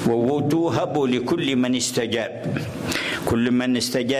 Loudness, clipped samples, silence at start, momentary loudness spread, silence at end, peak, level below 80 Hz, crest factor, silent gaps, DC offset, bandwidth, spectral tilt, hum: -22 LUFS; under 0.1%; 0 s; 6 LU; 0 s; -10 dBFS; -48 dBFS; 12 dB; none; under 0.1%; 16 kHz; -4.5 dB/octave; none